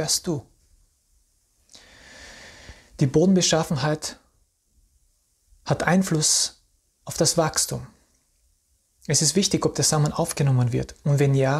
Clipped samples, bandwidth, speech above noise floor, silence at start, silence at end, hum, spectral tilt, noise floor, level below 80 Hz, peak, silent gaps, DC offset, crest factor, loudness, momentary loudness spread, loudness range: under 0.1%; 15 kHz; 45 dB; 0 s; 0 s; none; -4 dB/octave; -67 dBFS; -52 dBFS; -4 dBFS; none; under 0.1%; 20 dB; -22 LUFS; 23 LU; 2 LU